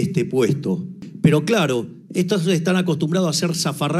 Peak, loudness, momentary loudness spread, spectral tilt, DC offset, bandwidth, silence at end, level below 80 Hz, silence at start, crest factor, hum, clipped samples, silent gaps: -2 dBFS; -20 LUFS; 8 LU; -5.5 dB/octave; under 0.1%; 14.5 kHz; 0 s; -58 dBFS; 0 s; 18 dB; none; under 0.1%; none